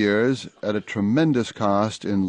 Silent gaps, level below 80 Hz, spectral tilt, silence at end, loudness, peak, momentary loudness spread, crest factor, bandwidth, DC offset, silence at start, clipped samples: none; -54 dBFS; -6.5 dB/octave; 0 s; -23 LUFS; -6 dBFS; 7 LU; 14 dB; 10 kHz; under 0.1%; 0 s; under 0.1%